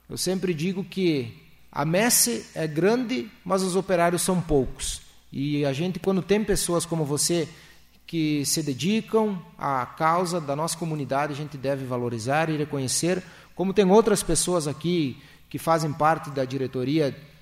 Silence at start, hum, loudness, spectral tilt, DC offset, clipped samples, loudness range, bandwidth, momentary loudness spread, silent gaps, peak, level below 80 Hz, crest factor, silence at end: 0.1 s; none; -25 LUFS; -4.5 dB/octave; under 0.1%; under 0.1%; 3 LU; 16 kHz; 9 LU; none; -6 dBFS; -46 dBFS; 20 dB; 0.15 s